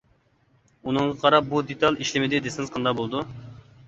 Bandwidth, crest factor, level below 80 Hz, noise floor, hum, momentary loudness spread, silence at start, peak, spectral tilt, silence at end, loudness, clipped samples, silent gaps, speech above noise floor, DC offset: 8.2 kHz; 22 dB; -58 dBFS; -63 dBFS; none; 13 LU; 0.85 s; -4 dBFS; -5 dB/octave; 0.25 s; -24 LUFS; under 0.1%; none; 40 dB; under 0.1%